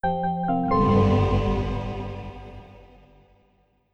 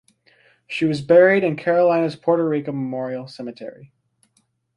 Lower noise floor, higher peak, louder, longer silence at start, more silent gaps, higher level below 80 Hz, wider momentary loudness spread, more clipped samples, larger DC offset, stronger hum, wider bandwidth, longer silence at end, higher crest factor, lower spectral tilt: about the same, -64 dBFS vs -66 dBFS; second, -8 dBFS vs -2 dBFS; second, -23 LUFS vs -19 LUFS; second, 0.05 s vs 0.7 s; neither; first, -36 dBFS vs -66 dBFS; first, 22 LU vs 19 LU; neither; neither; neither; second, 7 kHz vs 10.5 kHz; first, 1.15 s vs 0.9 s; about the same, 16 dB vs 18 dB; first, -9 dB/octave vs -7.5 dB/octave